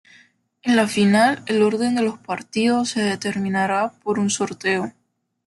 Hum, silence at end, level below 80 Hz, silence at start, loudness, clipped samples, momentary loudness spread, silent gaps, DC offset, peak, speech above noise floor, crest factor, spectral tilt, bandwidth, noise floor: none; 0.55 s; -64 dBFS; 0.65 s; -20 LUFS; under 0.1%; 8 LU; none; under 0.1%; -4 dBFS; 51 dB; 16 dB; -4.5 dB/octave; 12 kHz; -71 dBFS